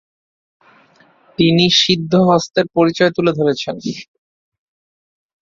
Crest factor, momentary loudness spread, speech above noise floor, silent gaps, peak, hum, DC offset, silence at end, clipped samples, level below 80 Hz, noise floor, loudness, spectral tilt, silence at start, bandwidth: 16 dB; 15 LU; 37 dB; none; 0 dBFS; none; under 0.1%; 1.4 s; under 0.1%; -54 dBFS; -52 dBFS; -14 LUFS; -5 dB/octave; 1.4 s; 7.6 kHz